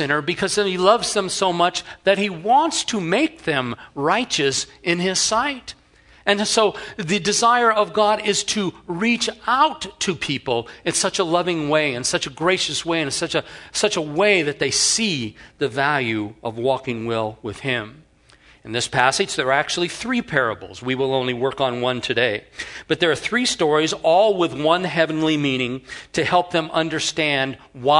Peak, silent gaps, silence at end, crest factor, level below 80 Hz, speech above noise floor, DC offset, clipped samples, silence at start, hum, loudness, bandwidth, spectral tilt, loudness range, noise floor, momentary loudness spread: 0 dBFS; none; 0 s; 20 dB; -56 dBFS; 32 dB; under 0.1%; under 0.1%; 0 s; none; -20 LUFS; 11 kHz; -3 dB/octave; 3 LU; -52 dBFS; 8 LU